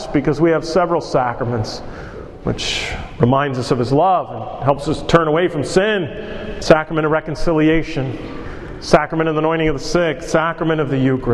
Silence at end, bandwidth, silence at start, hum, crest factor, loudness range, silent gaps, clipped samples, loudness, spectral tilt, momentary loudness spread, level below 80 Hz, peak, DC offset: 0 s; 12 kHz; 0 s; none; 18 dB; 2 LU; none; under 0.1%; -17 LUFS; -6 dB/octave; 13 LU; -34 dBFS; 0 dBFS; under 0.1%